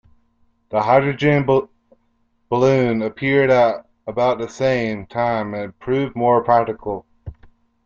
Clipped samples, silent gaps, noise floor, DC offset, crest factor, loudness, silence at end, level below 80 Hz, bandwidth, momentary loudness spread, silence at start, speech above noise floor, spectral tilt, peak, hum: under 0.1%; none; -64 dBFS; under 0.1%; 18 dB; -19 LUFS; 0.55 s; -52 dBFS; 7.4 kHz; 13 LU; 0.7 s; 46 dB; -7 dB/octave; -2 dBFS; none